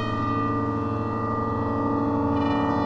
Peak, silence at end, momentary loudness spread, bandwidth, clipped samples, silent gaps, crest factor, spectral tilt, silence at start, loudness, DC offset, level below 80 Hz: -12 dBFS; 0 s; 3 LU; 6.8 kHz; under 0.1%; none; 12 dB; -8.5 dB/octave; 0 s; -25 LUFS; under 0.1%; -46 dBFS